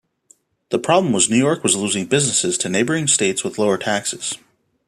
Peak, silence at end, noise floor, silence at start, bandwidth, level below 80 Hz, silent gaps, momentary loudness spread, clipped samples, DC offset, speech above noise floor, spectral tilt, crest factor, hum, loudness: 0 dBFS; 0.5 s; -56 dBFS; 0.7 s; 14.5 kHz; -62 dBFS; none; 8 LU; under 0.1%; under 0.1%; 38 dB; -3 dB/octave; 18 dB; none; -18 LUFS